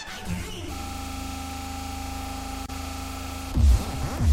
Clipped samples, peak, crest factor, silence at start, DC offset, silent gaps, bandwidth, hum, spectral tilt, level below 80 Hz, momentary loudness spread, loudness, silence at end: under 0.1%; -10 dBFS; 18 dB; 0 s; under 0.1%; none; 16.5 kHz; none; -5 dB/octave; -30 dBFS; 12 LU; -30 LUFS; 0 s